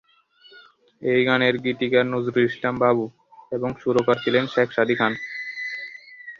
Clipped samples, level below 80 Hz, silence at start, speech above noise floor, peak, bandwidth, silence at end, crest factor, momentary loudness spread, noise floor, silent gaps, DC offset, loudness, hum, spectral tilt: under 0.1%; -62 dBFS; 0.55 s; 34 dB; -4 dBFS; 7.2 kHz; 0.05 s; 20 dB; 11 LU; -55 dBFS; none; under 0.1%; -22 LUFS; none; -6.5 dB/octave